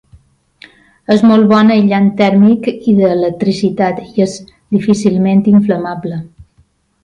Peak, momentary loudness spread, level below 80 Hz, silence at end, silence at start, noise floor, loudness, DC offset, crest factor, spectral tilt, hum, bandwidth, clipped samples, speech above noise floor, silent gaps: 0 dBFS; 11 LU; -50 dBFS; 0.75 s; 1.1 s; -53 dBFS; -11 LUFS; under 0.1%; 12 dB; -7.5 dB/octave; none; 9.6 kHz; under 0.1%; 43 dB; none